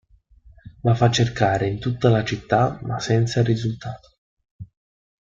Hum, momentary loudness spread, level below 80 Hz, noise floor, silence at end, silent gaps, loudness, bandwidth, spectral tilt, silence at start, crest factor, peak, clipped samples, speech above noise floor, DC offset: none; 10 LU; -48 dBFS; -52 dBFS; 0.6 s; 4.18-4.37 s, 4.51-4.59 s; -21 LUFS; 7.6 kHz; -6 dB/octave; 0.65 s; 20 dB; -4 dBFS; under 0.1%; 32 dB; under 0.1%